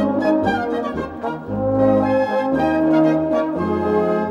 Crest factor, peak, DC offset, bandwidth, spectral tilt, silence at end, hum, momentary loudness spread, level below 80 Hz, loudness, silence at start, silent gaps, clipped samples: 14 dB; -4 dBFS; under 0.1%; 7.4 kHz; -8 dB/octave; 0 s; none; 9 LU; -46 dBFS; -19 LUFS; 0 s; none; under 0.1%